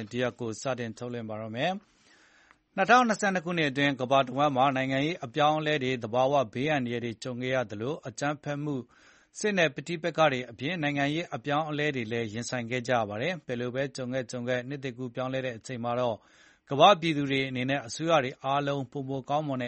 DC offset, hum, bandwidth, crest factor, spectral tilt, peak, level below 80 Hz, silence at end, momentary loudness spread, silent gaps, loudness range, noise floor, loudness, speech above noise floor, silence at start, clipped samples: under 0.1%; none; 8.4 kHz; 24 dB; -5 dB/octave; -6 dBFS; -68 dBFS; 0 s; 11 LU; none; 6 LU; -62 dBFS; -29 LUFS; 33 dB; 0 s; under 0.1%